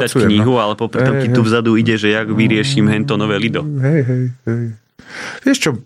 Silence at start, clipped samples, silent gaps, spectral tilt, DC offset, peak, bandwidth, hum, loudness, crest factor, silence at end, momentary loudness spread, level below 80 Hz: 0 s; under 0.1%; none; -6 dB/octave; under 0.1%; -2 dBFS; 14.5 kHz; none; -15 LUFS; 14 dB; 0 s; 8 LU; -54 dBFS